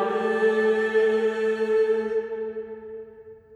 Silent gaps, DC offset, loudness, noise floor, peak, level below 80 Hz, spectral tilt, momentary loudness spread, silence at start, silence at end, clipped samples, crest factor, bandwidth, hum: none; under 0.1%; -23 LUFS; -46 dBFS; -12 dBFS; -66 dBFS; -5.5 dB/octave; 17 LU; 0 s; 0 s; under 0.1%; 12 dB; 9.2 kHz; none